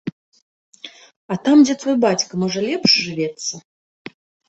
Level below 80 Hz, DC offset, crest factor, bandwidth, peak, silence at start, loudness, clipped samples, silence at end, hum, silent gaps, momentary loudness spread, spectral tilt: -64 dBFS; under 0.1%; 18 dB; 8.2 kHz; -2 dBFS; 0.05 s; -17 LUFS; under 0.1%; 0.9 s; none; 0.12-0.32 s, 0.42-0.72 s, 1.16-1.29 s; 26 LU; -4 dB/octave